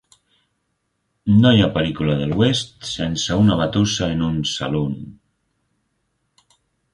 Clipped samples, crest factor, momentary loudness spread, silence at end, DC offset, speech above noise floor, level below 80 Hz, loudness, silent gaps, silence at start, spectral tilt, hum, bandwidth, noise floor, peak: under 0.1%; 20 dB; 12 LU; 1.8 s; under 0.1%; 54 dB; -42 dBFS; -19 LUFS; none; 1.25 s; -5.5 dB/octave; none; 11.5 kHz; -72 dBFS; -2 dBFS